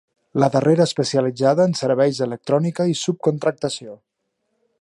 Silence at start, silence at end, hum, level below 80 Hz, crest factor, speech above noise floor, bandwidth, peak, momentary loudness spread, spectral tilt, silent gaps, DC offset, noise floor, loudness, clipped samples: 0.35 s; 0.85 s; none; -66 dBFS; 18 dB; 55 dB; 11.5 kHz; -2 dBFS; 10 LU; -6 dB/octave; none; under 0.1%; -74 dBFS; -19 LUFS; under 0.1%